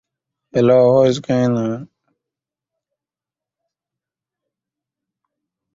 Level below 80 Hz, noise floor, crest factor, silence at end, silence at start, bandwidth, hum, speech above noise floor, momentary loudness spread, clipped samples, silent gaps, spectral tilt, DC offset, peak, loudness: -58 dBFS; -89 dBFS; 18 dB; 3.9 s; 0.55 s; 7.6 kHz; none; 74 dB; 12 LU; under 0.1%; none; -7.5 dB/octave; under 0.1%; -2 dBFS; -15 LUFS